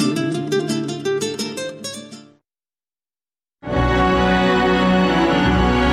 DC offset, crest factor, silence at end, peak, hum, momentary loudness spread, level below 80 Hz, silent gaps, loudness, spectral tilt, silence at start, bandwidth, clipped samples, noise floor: under 0.1%; 12 dB; 0 s; -6 dBFS; none; 14 LU; -32 dBFS; none; -18 LUFS; -5.5 dB/octave; 0 s; 14 kHz; under 0.1%; under -90 dBFS